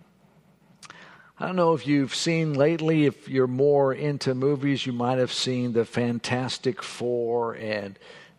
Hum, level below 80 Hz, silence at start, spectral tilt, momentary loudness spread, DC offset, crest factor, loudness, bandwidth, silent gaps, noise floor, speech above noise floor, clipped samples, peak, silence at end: none; -68 dBFS; 0.8 s; -5.5 dB/octave; 8 LU; under 0.1%; 18 dB; -25 LUFS; 12 kHz; none; -59 dBFS; 34 dB; under 0.1%; -6 dBFS; 0.15 s